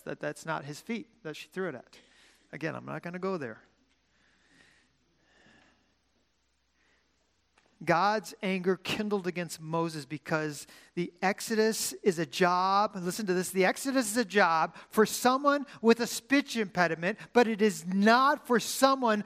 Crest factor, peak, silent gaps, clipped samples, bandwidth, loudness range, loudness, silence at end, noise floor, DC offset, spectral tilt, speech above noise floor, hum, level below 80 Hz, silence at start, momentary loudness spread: 22 dB; -8 dBFS; none; under 0.1%; 15.5 kHz; 14 LU; -29 LUFS; 0 s; -75 dBFS; under 0.1%; -4 dB/octave; 46 dB; none; -74 dBFS; 0.05 s; 13 LU